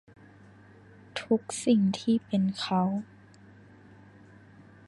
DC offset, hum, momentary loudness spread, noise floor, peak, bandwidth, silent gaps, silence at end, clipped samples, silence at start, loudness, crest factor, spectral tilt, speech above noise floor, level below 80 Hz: under 0.1%; none; 14 LU; -54 dBFS; -12 dBFS; 11.5 kHz; none; 1.85 s; under 0.1%; 1.15 s; -28 LUFS; 18 dB; -6 dB/octave; 27 dB; -68 dBFS